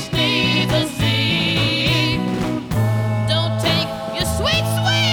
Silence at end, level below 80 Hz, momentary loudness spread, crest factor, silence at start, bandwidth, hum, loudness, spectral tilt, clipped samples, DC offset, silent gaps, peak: 0 s; -36 dBFS; 5 LU; 14 dB; 0 s; 19.5 kHz; none; -18 LUFS; -4.5 dB/octave; under 0.1%; under 0.1%; none; -4 dBFS